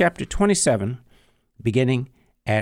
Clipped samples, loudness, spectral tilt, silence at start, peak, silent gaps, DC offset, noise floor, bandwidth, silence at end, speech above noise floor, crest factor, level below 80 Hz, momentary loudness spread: under 0.1%; -22 LUFS; -5 dB/octave; 0 s; -6 dBFS; none; under 0.1%; -58 dBFS; 15.5 kHz; 0 s; 38 dB; 18 dB; -40 dBFS; 16 LU